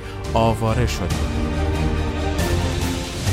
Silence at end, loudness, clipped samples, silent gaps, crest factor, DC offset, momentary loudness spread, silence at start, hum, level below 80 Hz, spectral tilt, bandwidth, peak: 0 s; -22 LUFS; under 0.1%; none; 16 dB; under 0.1%; 4 LU; 0 s; none; -28 dBFS; -5.5 dB/octave; 16 kHz; -4 dBFS